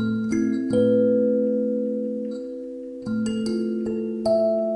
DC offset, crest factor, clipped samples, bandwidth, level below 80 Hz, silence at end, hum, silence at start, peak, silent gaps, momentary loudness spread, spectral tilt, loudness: under 0.1%; 14 dB; under 0.1%; 11 kHz; -58 dBFS; 0 s; none; 0 s; -10 dBFS; none; 13 LU; -7.5 dB/octave; -23 LUFS